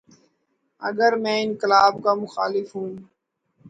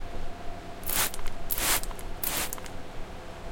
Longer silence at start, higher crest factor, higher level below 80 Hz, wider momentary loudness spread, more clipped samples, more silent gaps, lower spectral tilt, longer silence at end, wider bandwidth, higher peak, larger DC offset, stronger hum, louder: first, 0.8 s vs 0 s; about the same, 20 dB vs 20 dB; second, -70 dBFS vs -38 dBFS; about the same, 15 LU vs 17 LU; neither; neither; first, -4.5 dB/octave vs -1.5 dB/octave; about the same, 0 s vs 0 s; second, 9 kHz vs 17.5 kHz; first, -2 dBFS vs -10 dBFS; neither; neither; first, -21 LUFS vs -29 LUFS